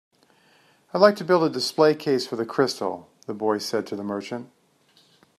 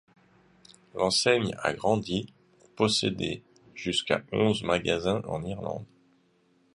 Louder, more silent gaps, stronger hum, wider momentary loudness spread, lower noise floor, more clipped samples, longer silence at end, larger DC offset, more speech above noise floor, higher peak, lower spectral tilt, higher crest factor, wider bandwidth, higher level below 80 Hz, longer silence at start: first, -23 LUFS vs -28 LUFS; neither; neither; about the same, 14 LU vs 13 LU; second, -61 dBFS vs -66 dBFS; neither; about the same, 0.95 s vs 0.9 s; neither; about the same, 38 dB vs 39 dB; first, -2 dBFS vs -8 dBFS; about the same, -5 dB/octave vs -4 dB/octave; about the same, 22 dB vs 22 dB; first, 13.5 kHz vs 11.5 kHz; second, -74 dBFS vs -56 dBFS; about the same, 0.95 s vs 0.95 s